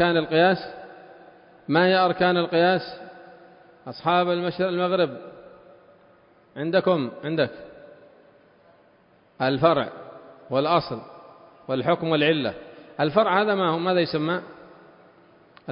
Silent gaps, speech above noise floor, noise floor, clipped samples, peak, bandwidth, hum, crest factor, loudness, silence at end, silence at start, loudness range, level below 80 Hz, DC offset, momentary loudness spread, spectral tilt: none; 36 dB; -58 dBFS; under 0.1%; -4 dBFS; 5.4 kHz; none; 22 dB; -23 LUFS; 0 s; 0 s; 6 LU; -64 dBFS; under 0.1%; 23 LU; -10.5 dB/octave